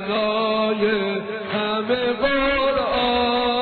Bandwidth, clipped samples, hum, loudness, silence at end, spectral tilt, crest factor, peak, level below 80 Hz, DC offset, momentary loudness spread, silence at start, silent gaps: 4.6 kHz; under 0.1%; none; -21 LUFS; 0 s; -7.5 dB/octave; 12 dB; -8 dBFS; -44 dBFS; under 0.1%; 5 LU; 0 s; none